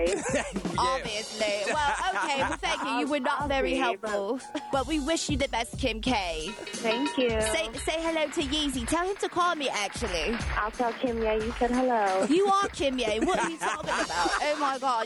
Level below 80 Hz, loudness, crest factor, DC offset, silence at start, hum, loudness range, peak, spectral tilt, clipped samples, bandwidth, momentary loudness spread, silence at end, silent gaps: -44 dBFS; -28 LUFS; 14 dB; under 0.1%; 0 s; none; 2 LU; -14 dBFS; -3.5 dB/octave; under 0.1%; 12 kHz; 5 LU; 0 s; none